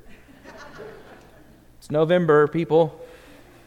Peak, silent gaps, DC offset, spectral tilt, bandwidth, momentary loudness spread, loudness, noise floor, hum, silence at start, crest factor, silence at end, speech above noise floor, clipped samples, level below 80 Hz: -6 dBFS; none; under 0.1%; -7.5 dB/octave; 11 kHz; 25 LU; -20 LUFS; -50 dBFS; none; 0.5 s; 18 dB; 0.6 s; 31 dB; under 0.1%; -56 dBFS